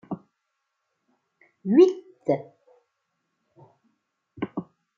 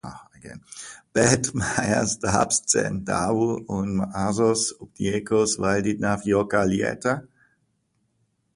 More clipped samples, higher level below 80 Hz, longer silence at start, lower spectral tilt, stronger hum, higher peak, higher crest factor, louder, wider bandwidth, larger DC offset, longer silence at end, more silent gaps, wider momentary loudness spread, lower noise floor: neither; second, -76 dBFS vs -48 dBFS; about the same, 0.1 s vs 0.05 s; first, -8 dB/octave vs -4 dB/octave; neither; second, -6 dBFS vs -2 dBFS; about the same, 22 dB vs 22 dB; about the same, -23 LUFS vs -23 LUFS; second, 7 kHz vs 11.5 kHz; neither; second, 0.35 s vs 1.35 s; neither; first, 20 LU vs 17 LU; first, -79 dBFS vs -71 dBFS